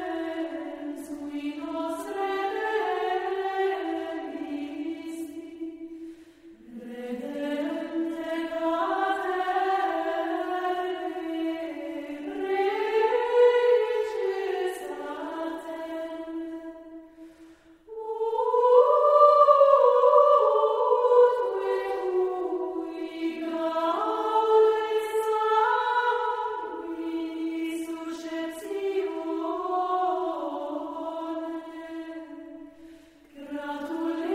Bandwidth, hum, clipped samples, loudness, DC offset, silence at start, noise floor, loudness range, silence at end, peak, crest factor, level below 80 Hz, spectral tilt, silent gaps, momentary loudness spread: 14.5 kHz; none; under 0.1%; -26 LUFS; under 0.1%; 0 s; -52 dBFS; 15 LU; 0 s; -6 dBFS; 20 dB; -68 dBFS; -4 dB/octave; none; 18 LU